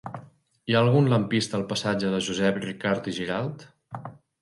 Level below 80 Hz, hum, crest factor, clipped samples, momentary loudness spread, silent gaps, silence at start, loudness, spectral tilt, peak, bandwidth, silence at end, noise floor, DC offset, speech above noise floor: -60 dBFS; none; 20 dB; under 0.1%; 20 LU; none; 0.05 s; -25 LUFS; -5.5 dB/octave; -6 dBFS; 11.5 kHz; 0.3 s; -50 dBFS; under 0.1%; 25 dB